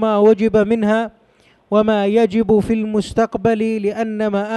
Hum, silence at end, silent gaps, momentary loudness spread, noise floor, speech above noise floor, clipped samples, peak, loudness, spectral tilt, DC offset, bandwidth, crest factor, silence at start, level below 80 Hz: none; 0 s; none; 7 LU; -54 dBFS; 38 dB; under 0.1%; -2 dBFS; -16 LUFS; -7 dB/octave; under 0.1%; 10.5 kHz; 14 dB; 0 s; -44 dBFS